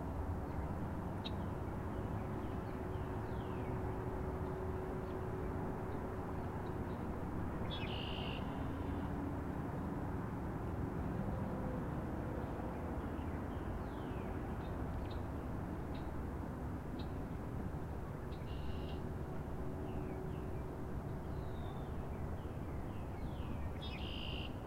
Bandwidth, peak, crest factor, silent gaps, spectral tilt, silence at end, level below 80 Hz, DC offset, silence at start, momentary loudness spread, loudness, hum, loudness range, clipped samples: 16 kHz; -28 dBFS; 14 dB; none; -7.5 dB/octave; 0 s; -48 dBFS; under 0.1%; 0 s; 3 LU; -43 LUFS; none; 3 LU; under 0.1%